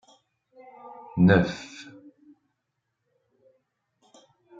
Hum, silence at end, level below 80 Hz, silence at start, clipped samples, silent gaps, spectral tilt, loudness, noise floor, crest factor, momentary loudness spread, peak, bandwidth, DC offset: none; 2.8 s; -60 dBFS; 0.85 s; under 0.1%; none; -7.5 dB/octave; -22 LUFS; -80 dBFS; 24 dB; 27 LU; -4 dBFS; 7.6 kHz; under 0.1%